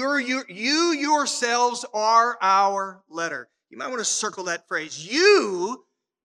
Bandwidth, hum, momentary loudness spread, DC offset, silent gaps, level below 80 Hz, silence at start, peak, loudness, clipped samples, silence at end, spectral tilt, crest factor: 12 kHz; none; 12 LU; under 0.1%; none; -84 dBFS; 0 s; -4 dBFS; -22 LUFS; under 0.1%; 0.45 s; -1.5 dB/octave; 18 dB